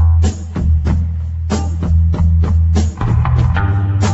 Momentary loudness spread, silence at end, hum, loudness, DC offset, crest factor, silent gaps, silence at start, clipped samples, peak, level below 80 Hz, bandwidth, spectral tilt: 6 LU; 0 s; none; -15 LUFS; under 0.1%; 10 dB; none; 0 s; under 0.1%; -2 dBFS; -18 dBFS; 8 kHz; -7 dB/octave